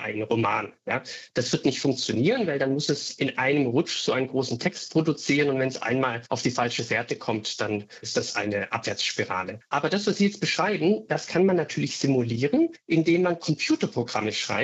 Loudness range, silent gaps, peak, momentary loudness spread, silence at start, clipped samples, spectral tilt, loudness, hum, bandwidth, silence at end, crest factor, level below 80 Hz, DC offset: 3 LU; none; -10 dBFS; 6 LU; 0 s; under 0.1%; -4.5 dB/octave; -25 LUFS; none; 8.2 kHz; 0 s; 16 dB; -68 dBFS; under 0.1%